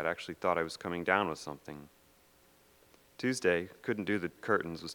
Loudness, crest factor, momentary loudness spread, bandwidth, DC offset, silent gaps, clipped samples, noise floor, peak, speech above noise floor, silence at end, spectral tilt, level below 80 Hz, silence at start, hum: -34 LUFS; 26 dB; 13 LU; 20 kHz; under 0.1%; none; under 0.1%; -65 dBFS; -10 dBFS; 31 dB; 0 s; -4.5 dB/octave; -68 dBFS; 0 s; none